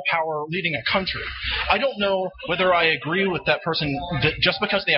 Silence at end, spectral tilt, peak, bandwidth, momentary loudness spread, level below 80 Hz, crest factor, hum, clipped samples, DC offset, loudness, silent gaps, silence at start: 0 s; -2 dB/octave; -4 dBFS; 5.8 kHz; 7 LU; -44 dBFS; 18 dB; none; under 0.1%; under 0.1%; -22 LUFS; none; 0 s